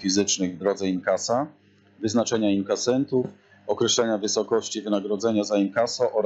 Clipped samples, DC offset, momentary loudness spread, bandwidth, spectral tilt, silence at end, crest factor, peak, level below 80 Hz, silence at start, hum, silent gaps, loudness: under 0.1%; under 0.1%; 5 LU; 8.2 kHz; -4 dB/octave; 0 s; 14 dB; -10 dBFS; -68 dBFS; 0 s; none; none; -24 LUFS